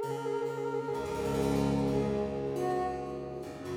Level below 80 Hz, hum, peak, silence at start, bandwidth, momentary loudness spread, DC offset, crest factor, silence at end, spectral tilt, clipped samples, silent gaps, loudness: -50 dBFS; none; -16 dBFS; 0 s; 17.5 kHz; 9 LU; under 0.1%; 16 dB; 0 s; -7 dB/octave; under 0.1%; none; -33 LUFS